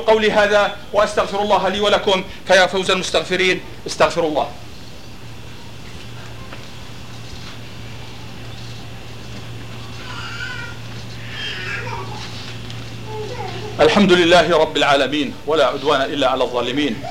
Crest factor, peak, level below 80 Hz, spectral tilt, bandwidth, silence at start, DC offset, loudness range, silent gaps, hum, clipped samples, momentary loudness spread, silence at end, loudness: 18 dB; -2 dBFS; -44 dBFS; -4 dB/octave; 16.5 kHz; 0 s; 2%; 18 LU; none; none; under 0.1%; 21 LU; 0 s; -17 LUFS